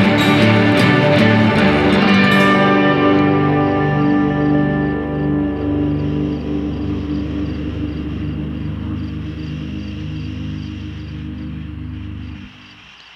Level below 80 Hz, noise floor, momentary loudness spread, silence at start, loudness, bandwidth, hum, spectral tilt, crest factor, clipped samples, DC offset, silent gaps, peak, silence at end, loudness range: -34 dBFS; -41 dBFS; 17 LU; 0 s; -16 LUFS; 12.5 kHz; 50 Hz at -40 dBFS; -7 dB/octave; 16 dB; under 0.1%; under 0.1%; none; 0 dBFS; 0.4 s; 15 LU